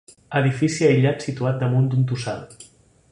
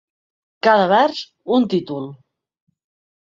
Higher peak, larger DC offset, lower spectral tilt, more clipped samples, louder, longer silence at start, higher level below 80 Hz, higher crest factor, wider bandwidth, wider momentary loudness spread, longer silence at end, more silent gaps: about the same, -4 dBFS vs -2 dBFS; neither; about the same, -6.5 dB/octave vs -6 dB/octave; neither; second, -21 LUFS vs -17 LUFS; second, 0.3 s vs 0.65 s; first, -56 dBFS vs -66 dBFS; about the same, 16 dB vs 18 dB; first, 11 kHz vs 7.6 kHz; second, 10 LU vs 16 LU; second, 0.5 s vs 1.1 s; neither